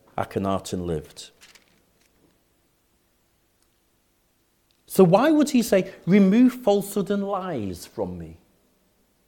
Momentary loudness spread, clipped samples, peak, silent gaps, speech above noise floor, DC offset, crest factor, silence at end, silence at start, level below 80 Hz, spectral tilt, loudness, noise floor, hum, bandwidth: 17 LU; under 0.1%; -4 dBFS; none; 45 dB; under 0.1%; 20 dB; 0.95 s; 0.15 s; -58 dBFS; -6.5 dB/octave; -22 LUFS; -67 dBFS; none; 18 kHz